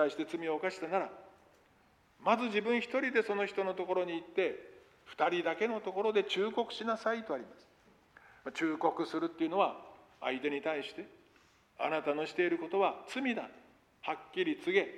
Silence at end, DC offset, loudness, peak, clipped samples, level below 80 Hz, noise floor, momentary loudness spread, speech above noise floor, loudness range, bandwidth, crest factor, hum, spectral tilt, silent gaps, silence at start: 0 s; under 0.1%; -34 LUFS; -14 dBFS; under 0.1%; -78 dBFS; -67 dBFS; 11 LU; 33 dB; 3 LU; 12 kHz; 20 dB; none; -5 dB/octave; none; 0 s